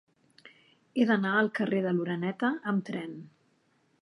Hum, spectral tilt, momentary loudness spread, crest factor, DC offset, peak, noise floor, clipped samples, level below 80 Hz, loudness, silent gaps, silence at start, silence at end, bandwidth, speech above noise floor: none; -7.5 dB/octave; 12 LU; 20 dB; under 0.1%; -12 dBFS; -70 dBFS; under 0.1%; -80 dBFS; -29 LUFS; none; 0.45 s; 0.75 s; 11 kHz; 41 dB